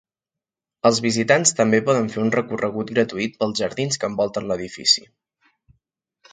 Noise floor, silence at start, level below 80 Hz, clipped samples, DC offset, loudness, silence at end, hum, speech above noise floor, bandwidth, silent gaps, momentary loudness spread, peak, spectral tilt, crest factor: -88 dBFS; 0.85 s; -60 dBFS; under 0.1%; under 0.1%; -20 LUFS; 1.3 s; none; 68 dB; 9.6 kHz; none; 8 LU; 0 dBFS; -3.5 dB/octave; 22 dB